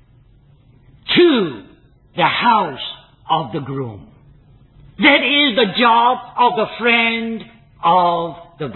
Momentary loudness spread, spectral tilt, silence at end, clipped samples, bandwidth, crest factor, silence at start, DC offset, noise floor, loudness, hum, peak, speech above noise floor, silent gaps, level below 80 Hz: 17 LU; -9 dB/octave; 0 s; under 0.1%; 4.3 kHz; 18 dB; 1.05 s; under 0.1%; -49 dBFS; -15 LUFS; none; 0 dBFS; 34 dB; none; -54 dBFS